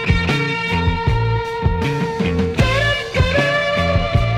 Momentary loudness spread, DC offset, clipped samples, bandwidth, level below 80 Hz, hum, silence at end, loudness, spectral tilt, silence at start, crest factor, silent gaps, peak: 4 LU; under 0.1%; under 0.1%; 13.5 kHz; -26 dBFS; none; 0 s; -18 LUFS; -6 dB/octave; 0 s; 16 dB; none; 0 dBFS